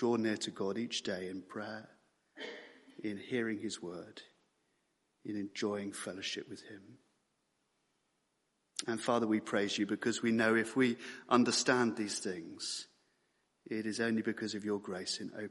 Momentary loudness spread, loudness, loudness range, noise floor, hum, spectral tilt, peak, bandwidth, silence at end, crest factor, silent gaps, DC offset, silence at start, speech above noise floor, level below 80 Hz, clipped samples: 18 LU; -36 LUFS; 11 LU; -81 dBFS; none; -3.5 dB/octave; -14 dBFS; 11.5 kHz; 0 s; 24 dB; none; under 0.1%; 0 s; 45 dB; -82 dBFS; under 0.1%